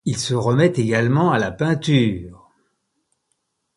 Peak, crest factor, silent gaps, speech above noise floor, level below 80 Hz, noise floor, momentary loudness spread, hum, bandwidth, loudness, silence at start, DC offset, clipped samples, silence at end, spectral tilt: -4 dBFS; 16 dB; none; 54 dB; -50 dBFS; -72 dBFS; 5 LU; none; 11.5 kHz; -19 LUFS; 0.05 s; under 0.1%; under 0.1%; 1.45 s; -6 dB/octave